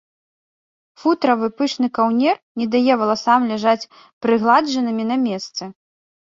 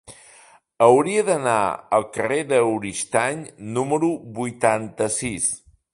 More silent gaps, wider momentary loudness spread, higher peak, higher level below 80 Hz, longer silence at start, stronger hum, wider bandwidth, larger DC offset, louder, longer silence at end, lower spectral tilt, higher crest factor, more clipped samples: first, 2.43-2.55 s, 4.13-4.21 s vs none; about the same, 9 LU vs 10 LU; about the same, -2 dBFS vs 0 dBFS; second, -66 dBFS vs -58 dBFS; first, 1.05 s vs 0.1 s; neither; second, 7.6 kHz vs 11.5 kHz; neither; first, -18 LUFS vs -21 LUFS; first, 0.55 s vs 0.35 s; about the same, -5 dB/octave vs -4.5 dB/octave; about the same, 18 dB vs 20 dB; neither